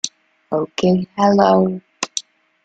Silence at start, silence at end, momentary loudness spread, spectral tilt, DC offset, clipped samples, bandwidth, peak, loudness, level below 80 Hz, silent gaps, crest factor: 0.05 s; 0.45 s; 13 LU; -5 dB/octave; under 0.1%; under 0.1%; 9.2 kHz; -2 dBFS; -18 LUFS; -56 dBFS; none; 18 dB